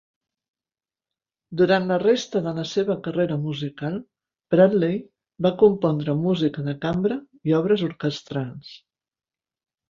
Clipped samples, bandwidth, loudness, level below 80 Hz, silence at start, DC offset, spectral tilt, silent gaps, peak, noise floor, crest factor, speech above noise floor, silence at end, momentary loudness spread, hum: under 0.1%; 7.4 kHz; -23 LUFS; -60 dBFS; 1.5 s; under 0.1%; -7 dB/octave; none; -4 dBFS; under -90 dBFS; 20 dB; over 68 dB; 1.15 s; 12 LU; none